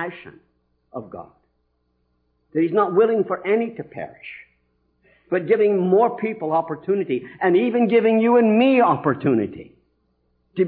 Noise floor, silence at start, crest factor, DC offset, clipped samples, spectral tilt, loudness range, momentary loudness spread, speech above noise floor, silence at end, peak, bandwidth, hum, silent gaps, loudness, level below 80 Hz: -69 dBFS; 0 s; 16 dB; under 0.1%; under 0.1%; -11 dB/octave; 5 LU; 21 LU; 49 dB; 0 s; -6 dBFS; 4.5 kHz; none; none; -19 LUFS; -66 dBFS